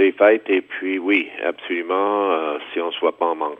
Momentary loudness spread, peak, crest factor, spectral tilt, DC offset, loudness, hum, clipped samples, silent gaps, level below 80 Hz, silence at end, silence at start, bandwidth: 10 LU; -2 dBFS; 18 dB; -6 dB/octave; under 0.1%; -20 LUFS; none; under 0.1%; none; -76 dBFS; 0.05 s; 0 s; 3.8 kHz